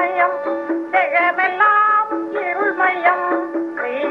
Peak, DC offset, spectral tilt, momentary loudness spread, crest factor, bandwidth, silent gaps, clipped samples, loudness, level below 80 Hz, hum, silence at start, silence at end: -2 dBFS; under 0.1%; -5 dB/octave; 9 LU; 16 dB; 6.2 kHz; none; under 0.1%; -17 LUFS; -78 dBFS; none; 0 s; 0 s